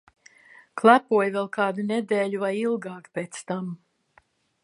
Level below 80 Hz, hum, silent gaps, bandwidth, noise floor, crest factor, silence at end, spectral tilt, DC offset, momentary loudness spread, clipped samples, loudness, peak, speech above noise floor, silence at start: -78 dBFS; none; none; 11.5 kHz; -62 dBFS; 24 dB; 0.9 s; -5.5 dB/octave; under 0.1%; 16 LU; under 0.1%; -24 LUFS; -2 dBFS; 39 dB; 0.75 s